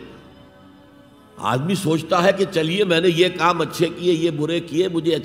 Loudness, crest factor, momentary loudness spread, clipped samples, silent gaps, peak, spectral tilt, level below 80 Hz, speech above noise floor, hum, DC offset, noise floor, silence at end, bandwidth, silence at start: -19 LUFS; 18 dB; 5 LU; under 0.1%; none; -4 dBFS; -5.5 dB/octave; -58 dBFS; 29 dB; none; under 0.1%; -48 dBFS; 0 s; 16 kHz; 0 s